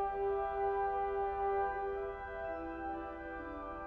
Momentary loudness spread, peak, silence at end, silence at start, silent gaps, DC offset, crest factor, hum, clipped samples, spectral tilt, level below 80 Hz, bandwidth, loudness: 9 LU; -26 dBFS; 0 s; 0 s; none; under 0.1%; 12 dB; none; under 0.1%; -8 dB/octave; -54 dBFS; 4.6 kHz; -38 LUFS